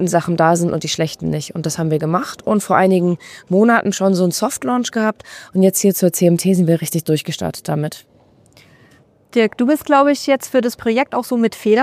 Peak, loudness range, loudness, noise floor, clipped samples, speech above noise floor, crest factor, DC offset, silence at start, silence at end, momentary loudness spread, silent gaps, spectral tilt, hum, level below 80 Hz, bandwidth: 0 dBFS; 3 LU; -17 LUFS; -51 dBFS; under 0.1%; 35 dB; 16 dB; under 0.1%; 0 s; 0 s; 9 LU; none; -5.5 dB/octave; none; -56 dBFS; 15.5 kHz